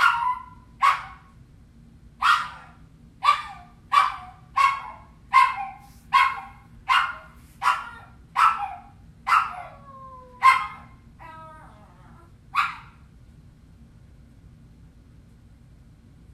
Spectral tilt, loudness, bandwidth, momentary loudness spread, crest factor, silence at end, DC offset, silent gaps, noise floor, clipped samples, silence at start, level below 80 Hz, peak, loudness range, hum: -1.5 dB/octave; -23 LUFS; 14 kHz; 24 LU; 24 dB; 3.55 s; under 0.1%; none; -51 dBFS; under 0.1%; 0 s; -54 dBFS; -2 dBFS; 11 LU; none